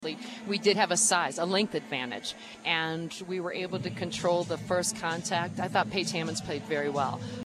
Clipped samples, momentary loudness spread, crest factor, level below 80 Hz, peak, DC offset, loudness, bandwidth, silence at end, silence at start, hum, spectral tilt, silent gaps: under 0.1%; 10 LU; 20 dB; -64 dBFS; -10 dBFS; under 0.1%; -29 LUFS; 14 kHz; 0 s; 0 s; none; -3 dB/octave; none